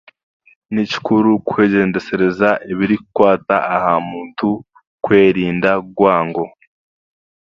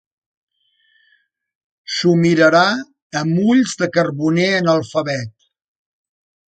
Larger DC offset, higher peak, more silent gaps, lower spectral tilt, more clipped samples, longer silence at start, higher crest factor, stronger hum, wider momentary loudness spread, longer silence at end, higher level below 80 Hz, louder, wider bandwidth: neither; about the same, 0 dBFS vs 0 dBFS; about the same, 4.87-4.98 s vs 3.02-3.10 s; first, -7.5 dB/octave vs -5.5 dB/octave; neither; second, 0.7 s vs 1.9 s; about the same, 16 dB vs 18 dB; neither; second, 9 LU vs 13 LU; second, 1 s vs 1.25 s; first, -52 dBFS vs -62 dBFS; about the same, -16 LUFS vs -16 LUFS; second, 7.2 kHz vs 9.2 kHz